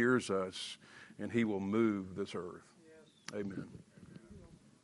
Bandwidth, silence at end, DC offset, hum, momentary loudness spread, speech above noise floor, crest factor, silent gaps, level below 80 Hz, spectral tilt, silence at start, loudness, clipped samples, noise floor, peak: 11.5 kHz; 0.3 s; under 0.1%; none; 23 LU; 25 dB; 20 dB; none; -74 dBFS; -5.5 dB/octave; 0 s; -37 LUFS; under 0.1%; -61 dBFS; -18 dBFS